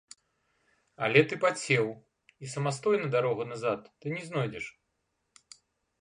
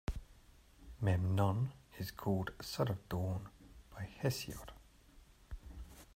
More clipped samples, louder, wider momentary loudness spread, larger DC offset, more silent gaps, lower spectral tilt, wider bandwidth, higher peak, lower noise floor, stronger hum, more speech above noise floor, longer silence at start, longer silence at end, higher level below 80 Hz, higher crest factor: neither; first, -29 LUFS vs -39 LUFS; second, 16 LU vs 21 LU; neither; neither; second, -5 dB/octave vs -6.5 dB/octave; second, 11 kHz vs 16 kHz; first, -8 dBFS vs -20 dBFS; first, -79 dBFS vs -63 dBFS; neither; first, 50 dB vs 26 dB; first, 1 s vs 0.1 s; first, 1.3 s vs 0.05 s; second, -72 dBFS vs -54 dBFS; about the same, 24 dB vs 20 dB